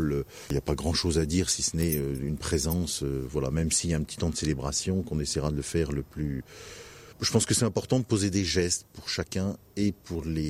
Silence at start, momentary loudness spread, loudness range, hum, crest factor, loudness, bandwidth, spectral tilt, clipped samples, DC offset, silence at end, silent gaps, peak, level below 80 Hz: 0 s; 8 LU; 2 LU; none; 20 dB; -28 LUFS; 16 kHz; -4.5 dB/octave; under 0.1%; under 0.1%; 0 s; none; -8 dBFS; -42 dBFS